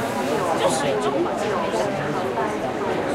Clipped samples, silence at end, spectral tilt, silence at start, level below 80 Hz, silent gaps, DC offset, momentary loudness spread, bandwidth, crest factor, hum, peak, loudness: under 0.1%; 0 s; -4.5 dB/octave; 0 s; -52 dBFS; none; under 0.1%; 4 LU; 16 kHz; 14 dB; none; -8 dBFS; -23 LUFS